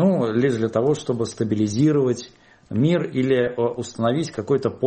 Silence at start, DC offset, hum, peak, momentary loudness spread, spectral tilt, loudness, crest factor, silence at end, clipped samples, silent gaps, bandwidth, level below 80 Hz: 0 s; under 0.1%; none; -6 dBFS; 7 LU; -7 dB/octave; -22 LUFS; 14 dB; 0 s; under 0.1%; none; 8.8 kHz; -58 dBFS